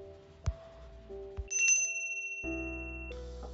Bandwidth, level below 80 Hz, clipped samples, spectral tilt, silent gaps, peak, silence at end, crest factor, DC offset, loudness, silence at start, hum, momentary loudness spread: 7.6 kHz; -48 dBFS; under 0.1%; -3.5 dB/octave; none; -16 dBFS; 0 s; 20 dB; under 0.1%; -32 LUFS; 0 s; none; 24 LU